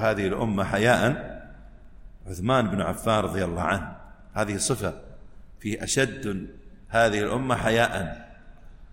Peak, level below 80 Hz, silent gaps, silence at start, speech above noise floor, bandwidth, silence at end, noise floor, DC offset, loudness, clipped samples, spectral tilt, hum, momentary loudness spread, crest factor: -6 dBFS; -44 dBFS; none; 0 s; 21 dB; 16.5 kHz; 0.05 s; -45 dBFS; under 0.1%; -25 LUFS; under 0.1%; -4.5 dB/octave; none; 15 LU; 20 dB